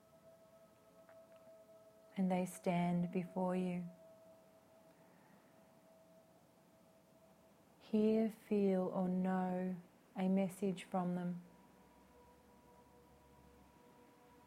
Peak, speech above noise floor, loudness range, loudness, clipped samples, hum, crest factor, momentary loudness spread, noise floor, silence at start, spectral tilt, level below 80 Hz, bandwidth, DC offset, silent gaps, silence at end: -24 dBFS; 30 dB; 10 LU; -39 LUFS; under 0.1%; none; 18 dB; 26 LU; -68 dBFS; 0.25 s; -8 dB/octave; -80 dBFS; 15 kHz; under 0.1%; none; 3 s